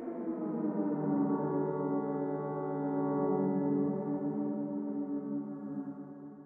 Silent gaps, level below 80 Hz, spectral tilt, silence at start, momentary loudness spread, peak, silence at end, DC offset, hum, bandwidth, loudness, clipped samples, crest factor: none; -80 dBFS; -13 dB/octave; 0 s; 9 LU; -20 dBFS; 0 s; under 0.1%; none; 2.4 kHz; -34 LUFS; under 0.1%; 14 dB